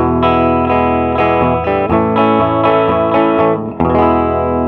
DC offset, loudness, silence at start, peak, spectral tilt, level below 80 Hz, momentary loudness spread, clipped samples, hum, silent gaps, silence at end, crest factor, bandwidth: under 0.1%; -12 LUFS; 0 s; 0 dBFS; -9.5 dB/octave; -32 dBFS; 3 LU; under 0.1%; none; none; 0 s; 12 dB; 5.6 kHz